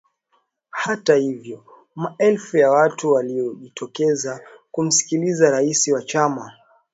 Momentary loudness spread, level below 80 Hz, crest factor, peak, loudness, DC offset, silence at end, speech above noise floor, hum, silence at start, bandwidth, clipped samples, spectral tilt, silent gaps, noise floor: 17 LU; -70 dBFS; 20 dB; -2 dBFS; -19 LUFS; under 0.1%; 0.4 s; 48 dB; none; 0.75 s; 8 kHz; under 0.1%; -3.5 dB/octave; none; -67 dBFS